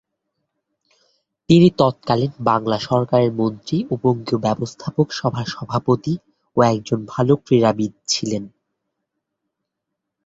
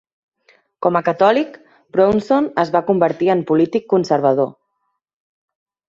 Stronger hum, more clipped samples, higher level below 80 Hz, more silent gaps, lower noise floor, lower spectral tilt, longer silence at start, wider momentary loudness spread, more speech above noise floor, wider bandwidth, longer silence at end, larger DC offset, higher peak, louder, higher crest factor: neither; neither; about the same, -54 dBFS vs -58 dBFS; neither; first, -80 dBFS vs -72 dBFS; about the same, -6.5 dB/octave vs -7.5 dB/octave; first, 1.5 s vs 0.8 s; first, 10 LU vs 6 LU; first, 62 dB vs 56 dB; about the same, 8 kHz vs 7.6 kHz; first, 1.8 s vs 1.4 s; neither; about the same, -2 dBFS vs -2 dBFS; about the same, -19 LUFS vs -17 LUFS; about the same, 18 dB vs 16 dB